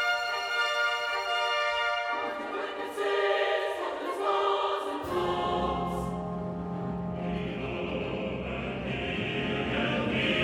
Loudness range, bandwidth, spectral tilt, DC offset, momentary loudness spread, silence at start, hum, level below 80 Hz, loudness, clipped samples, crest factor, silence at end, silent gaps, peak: 4 LU; 17 kHz; -5 dB/octave; under 0.1%; 7 LU; 0 s; none; -50 dBFS; -30 LUFS; under 0.1%; 16 dB; 0 s; none; -14 dBFS